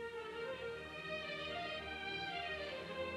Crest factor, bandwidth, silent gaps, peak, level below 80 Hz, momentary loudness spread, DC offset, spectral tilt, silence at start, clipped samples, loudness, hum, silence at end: 12 dB; 13 kHz; none; -32 dBFS; -66 dBFS; 4 LU; under 0.1%; -4 dB/octave; 0 s; under 0.1%; -43 LUFS; none; 0 s